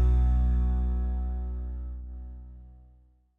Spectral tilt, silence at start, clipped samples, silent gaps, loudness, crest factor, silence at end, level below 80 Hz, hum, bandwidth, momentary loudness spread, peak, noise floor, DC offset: -10.5 dB/octave; 0 s; under 0.1%; none; -30 LUFS; 12 dB; 0.6 s; -28 dBFS; none; 1.8 kHz; 21 LU; -16 dBFS; -59 dBFS; under 0.1%